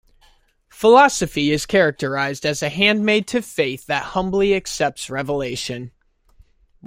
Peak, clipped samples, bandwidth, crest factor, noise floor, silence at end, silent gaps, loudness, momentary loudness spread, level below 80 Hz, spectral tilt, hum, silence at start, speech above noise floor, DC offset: -2 dBFS; under 0.1%; 16.5 kHz; 18 dB; -56 dBFS; 0 s; none; -19 LUFS; 12 LU; -48 dBFS; -4 dB/octave; none; 0.75 s; 38 dB; under 0.1%